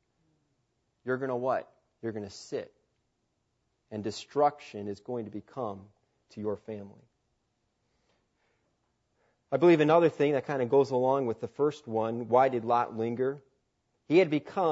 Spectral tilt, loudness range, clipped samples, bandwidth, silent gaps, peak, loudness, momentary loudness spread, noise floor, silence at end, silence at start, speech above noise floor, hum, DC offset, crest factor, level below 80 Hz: -7 dB/octave; 16 LU; under 0.1%; 8 kHz; none; -10 dBFS; -29 LUFS; 16 LU; -78 dBFS; 0 s; 1.05 s; 49 dB; none; under 0.1%; 20 dB; -78 dBFS